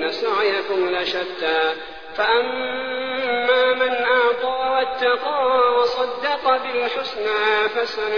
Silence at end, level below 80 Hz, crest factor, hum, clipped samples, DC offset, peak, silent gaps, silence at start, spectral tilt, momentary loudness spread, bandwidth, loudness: 0 s; -58 dBFS; 14 dB; none; under 0.1%; 0.5%; -6 dBFS; none; 0 s; -3.5 dB/octave; 7 LU; 5.4 kHz; -20 LUFS